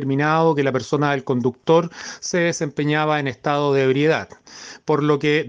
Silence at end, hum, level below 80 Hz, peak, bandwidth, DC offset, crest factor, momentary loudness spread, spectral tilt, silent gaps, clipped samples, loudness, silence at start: 0 s; none; -62 dBFS; -4 dBFS; 9.4 kHz; under 0.1%; 16 dB; 12 LU; -5.5 dB/octave; none; under 0.1%; -20 LUFS; 0 s